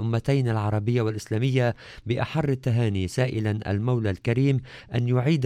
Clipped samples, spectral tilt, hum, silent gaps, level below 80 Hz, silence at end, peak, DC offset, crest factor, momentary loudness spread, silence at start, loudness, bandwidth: under 0.1%; -7.5 dB/octave; none; none; -52 dBFS; 0 s; -10 dBFS; under 0.1%; 14 dB; 5 LU; 0 s; -25 LUFS; 11 kHz